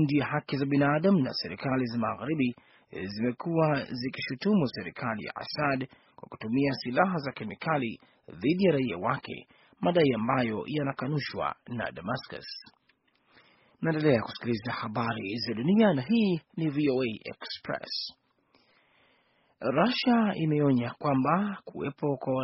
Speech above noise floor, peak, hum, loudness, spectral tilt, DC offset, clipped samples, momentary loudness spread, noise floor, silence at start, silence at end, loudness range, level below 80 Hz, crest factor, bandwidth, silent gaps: 41 dB; -8 dBFS; none; -29 LUFS; -5 dB/octave; under 0.1%; under 0.1%; 12 LU; -70 dBFS; 0 s; 0 s; 5 LU; -66 dBFS; 20 dB; 6 kHz; none